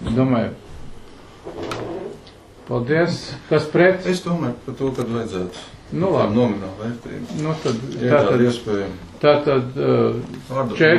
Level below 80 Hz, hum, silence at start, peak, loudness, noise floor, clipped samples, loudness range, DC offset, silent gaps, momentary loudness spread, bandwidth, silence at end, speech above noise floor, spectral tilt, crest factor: -46 dBFS; none; 0 s; 0 dBFS; -20 LUFS; -43 dBFS; under 0.1%; 5 LU; under 0.1%; none; 15 LU; 12.5 kHz; 0 s; 24 dB; -7 dB/octave; 20 dB